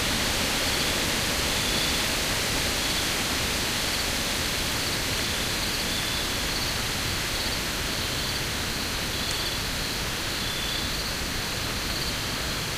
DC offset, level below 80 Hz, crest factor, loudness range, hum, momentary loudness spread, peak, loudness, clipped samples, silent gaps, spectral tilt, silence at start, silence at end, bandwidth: under 0.1%; -38 dBFS; 16 dB; 3 LU; none; 4 LU; -12 dBFS; -25 LUFS; under 0.1%; none; -2 dB/octave; 0 s; 0 s; 16 kHz